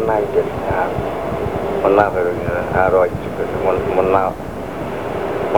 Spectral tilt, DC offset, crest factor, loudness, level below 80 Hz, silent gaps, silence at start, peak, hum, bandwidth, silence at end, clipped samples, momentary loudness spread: -7.5 dB/octave; 1%; 18 dB; -18 LUFS; -38 dBFS; none; 0 s; 0 dBFS; none; over 20 kHz; 0 s; under 0.1%; 9 LU